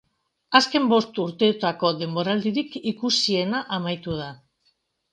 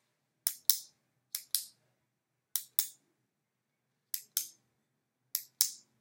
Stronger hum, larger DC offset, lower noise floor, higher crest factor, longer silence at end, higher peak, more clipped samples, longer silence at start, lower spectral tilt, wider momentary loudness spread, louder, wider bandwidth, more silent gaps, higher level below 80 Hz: neither; neither; second, -69 dBFS vs -84 dBFS; second, 24 dB vs 36 dB; first, 0.8 s vs 0.25 s; about the same, 0 dBFS vs -2 dBFS; neither; about the same, 0.5 s vs 0.45 s; first, -4.5 dB/octave vs 4.5 dB/octave; about the same, 10 LU vs 12 LU; first, -23 LUFS vs -34 LUFS; second, 10 kHz vs 16.5 kHz; neither; first, -62 dBFS vs under -90 dBFS